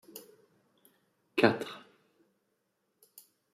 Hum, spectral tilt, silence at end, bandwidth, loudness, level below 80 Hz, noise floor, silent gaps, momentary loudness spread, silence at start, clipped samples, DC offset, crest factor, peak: none; -5.5 dB/octave; 1.75 s; 15.5 kHz; -30 LUFS; -82 dBFS; -79 dBFS; none; 23 LU; 0.15 s; under 0.1%; under 0.1%; 30 dB; -8 dBFS